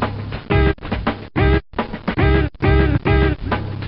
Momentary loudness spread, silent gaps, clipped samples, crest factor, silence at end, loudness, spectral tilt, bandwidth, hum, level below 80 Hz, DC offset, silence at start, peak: 8 LU; none; under 0.1%; 16 dB; 0 s; -19 LUFS; -11.5 dB/octave; 5.4 kHz; none; -22 dBFS; under 0.1%; 0 s; -2 dBFS